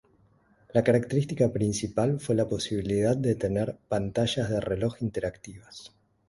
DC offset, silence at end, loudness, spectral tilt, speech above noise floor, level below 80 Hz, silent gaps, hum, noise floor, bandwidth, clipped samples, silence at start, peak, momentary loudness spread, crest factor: under 0.1%; 0.4 s; -27 LUFS; -6 dB/octave; 36 dB; -52 dBFS; none; none; -63 dBFS; 11.5 kHz; under 0.1%; 0.75 s; -8 dBFS; 10 LU; 20 dB